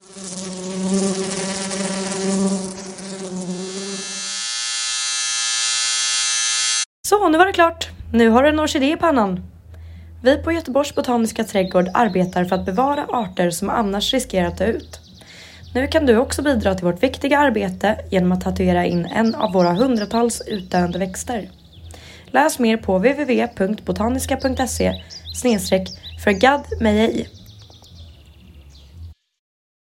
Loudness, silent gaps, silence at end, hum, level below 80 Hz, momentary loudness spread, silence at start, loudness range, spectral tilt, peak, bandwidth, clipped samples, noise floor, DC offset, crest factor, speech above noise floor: -19 LUFS; 6.86-7.03 s; 0.7 s; none; -44 dBFS; 12 LU; 0.1 s; 6 LU; -4 dB/octave; -2 dBFS; 16 kHz; under 0.1%; -44 dBFS; under 0.1%; 18 dB; 26 dB